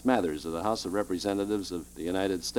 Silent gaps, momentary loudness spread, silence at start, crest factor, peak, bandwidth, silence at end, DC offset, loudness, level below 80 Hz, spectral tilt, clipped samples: none; 5 LU; 0 s; 20 dB; -8 dBFS; 19 kHz; 0 s; under 0.1%; -31 LUFS; -54 dBFS; -4.5 dB/octave; under 0.1%